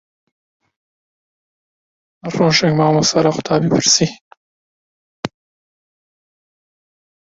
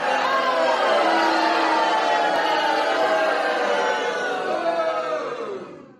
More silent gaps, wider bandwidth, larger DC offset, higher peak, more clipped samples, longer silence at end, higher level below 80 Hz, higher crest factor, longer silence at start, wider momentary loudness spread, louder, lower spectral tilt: first, 4.21-4.31 s, 4.37-5.23 s vs none; second, 8 kHz vs 12.5 kHz; neither; first, 0 dBFS vs -8 dBFS; neither; first, 1.95 s vs 0.15 s; first, -54 dBFS vs -72 dBFS; first, 20 dB vs 14 dB; first, 2.25 s vs 0 s; first, 17 LU vs 7 LU; first, -14 LUFS vs -21 LUFS; first, -4 dB/octave vs -2.5 dB/octave